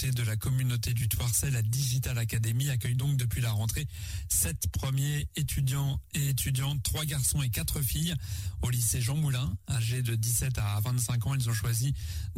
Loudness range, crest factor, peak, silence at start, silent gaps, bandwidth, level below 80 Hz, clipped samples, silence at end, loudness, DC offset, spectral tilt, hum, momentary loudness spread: 1 LU; 14 dB; -16 dBFS; 0 s; none; 16.5 kHz; -42 dBFS; under 0.1%; 0 s; -30 LUFS; under 0.1%; -4 dB/octave; none; 5 LU